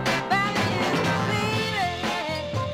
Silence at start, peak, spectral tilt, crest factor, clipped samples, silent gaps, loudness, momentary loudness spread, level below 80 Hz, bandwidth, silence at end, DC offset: 0 s; -10 dBFS; -4.5 dB/octave; 14 dB; under 0.1%; none; -24 LUFS; 5 LU; -50 dBFS; 16.5 kHz; 0 s; under 0.1%